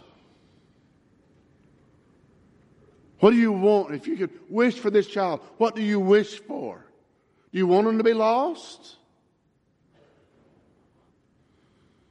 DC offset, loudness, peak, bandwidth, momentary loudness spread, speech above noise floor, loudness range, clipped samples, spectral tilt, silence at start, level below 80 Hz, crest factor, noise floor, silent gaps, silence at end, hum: under 0.1%; -23 LUFS; -4 dBFS; 9 kHz; 15 LU; 45 dB; 5 LU; under 0.1%; -7 dB/octave; 3.2 s; -72 dBFS; 22 dB; -67 dBFS; none; 3.35 s; none